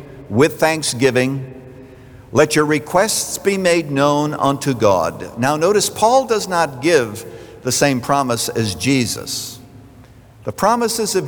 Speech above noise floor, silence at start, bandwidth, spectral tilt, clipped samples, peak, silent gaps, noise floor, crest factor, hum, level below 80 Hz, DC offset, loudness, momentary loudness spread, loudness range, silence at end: 26 dB; 0 s; over 20 kHz; -4 dB/octave; under 0.1%; -2 dBFS; none; -43 dBFS; 16 dB; none; -50 dBFS; under 0.1%; -17 LUFS; 10 LU; 3 LU; 0 s